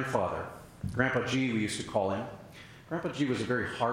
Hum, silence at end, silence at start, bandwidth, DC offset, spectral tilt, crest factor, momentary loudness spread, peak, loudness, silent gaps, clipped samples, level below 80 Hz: none; 0 s; 0 s; 16 kHz; under 0.1%; -5.5 dB/octave; 20 dB; 14 LU; -12 dBFS; -32 LUFS; none; under 0.1%; -58 dBFS